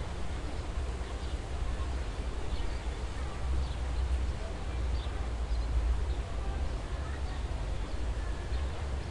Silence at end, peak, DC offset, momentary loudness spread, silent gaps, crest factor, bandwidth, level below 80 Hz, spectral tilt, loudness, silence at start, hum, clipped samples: 0 s; -20 dBFS; 0.2%; 5 LU; none; 12 dB; 11 kHz; -34 dBFS; -6 dB/octave; -37 LUFS; 0 s; none; under 0.1%